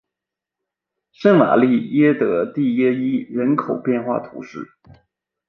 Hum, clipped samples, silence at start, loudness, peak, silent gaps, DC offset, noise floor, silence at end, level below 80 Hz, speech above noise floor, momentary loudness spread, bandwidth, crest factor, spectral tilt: none; under 0.1%; 1.2 s; -18 LUFS; -2 dBFS; none; under 0.1%; -86 dBFS; 0.85 s; -64 dBFS; 68 dB; 19 LU; 6.2 kHz; 18 dB; -9 dB/octave